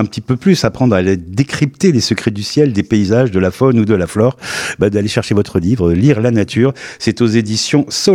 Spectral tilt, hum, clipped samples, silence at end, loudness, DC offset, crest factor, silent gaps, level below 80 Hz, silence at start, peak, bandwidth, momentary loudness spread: -6 dB/octave; none; under 0.1%; 0 s; -14 LUFS; under 0.1%; 12 dB; none; -40 dBFS; 0 s; 0 dBFS; 15.5 kHz; 5 LU